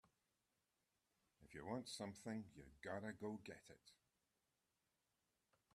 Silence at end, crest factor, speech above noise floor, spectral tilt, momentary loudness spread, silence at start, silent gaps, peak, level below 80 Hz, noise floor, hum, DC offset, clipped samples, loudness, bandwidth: 1.8 s; 22 dB; 37 dB; -5 dB/octave; 12 LU; 1.4 s; none; -34 dBFS; -82 dBFS; -89 dBFS; none; under 0.1%; under 0.1%; -53 LUFS; 13 kHz